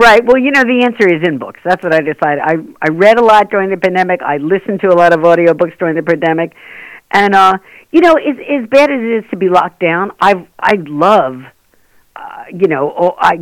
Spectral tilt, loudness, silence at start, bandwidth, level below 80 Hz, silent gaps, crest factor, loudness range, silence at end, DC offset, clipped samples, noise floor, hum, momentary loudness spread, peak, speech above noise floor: -6 dB/octave; -11 LUFS; 0 s; 17.5 kHz; -48 dBFS; none; 10 dB; 3 LU; 0 s; under 0.1%; 1%; -50 dBFS; none; 9 LU; 0 dBFS; 39 dB